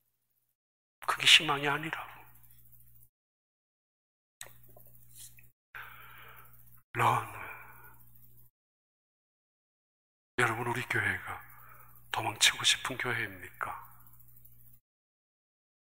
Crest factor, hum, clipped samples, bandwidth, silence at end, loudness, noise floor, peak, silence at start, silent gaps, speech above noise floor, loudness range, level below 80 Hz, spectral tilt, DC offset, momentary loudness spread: 30 dB; 60 Hz at -65 dBFS; under 0.1%; 16 kHz; 2 s; -29 LUFS; -79 dBFS; -6 dBFS; 1 s; 3.09-4.41 s, 5.52-5.73 s, 6.84-6.94 s, 8.50-10.38 s; 49 dB; 23 LU; -68 dBFS; -1.5 dB/octave; 0.2%; 27 LU